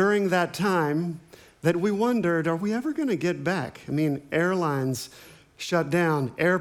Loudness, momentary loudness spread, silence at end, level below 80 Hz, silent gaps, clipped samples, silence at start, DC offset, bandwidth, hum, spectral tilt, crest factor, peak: -26 LUFS; 7 LU; 0 s; -66 dBFS; none; under 0.1%; 0 s; under 0.1%; 19 kHz; none; -6 dB/octave; 16 dB; -8 dBFS